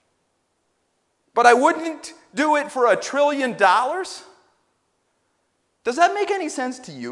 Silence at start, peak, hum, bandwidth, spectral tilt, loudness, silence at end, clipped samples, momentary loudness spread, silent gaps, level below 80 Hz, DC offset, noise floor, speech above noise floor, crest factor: 1.35 s; 0 dBFS; none; 11.5 kHz; -3 dB/octave; -20 LUFS; 0 s; under 0.1%; 16 LU; none; -72 dBFS; under 0.1%; -70 dBFS; 51 dB; 22 dB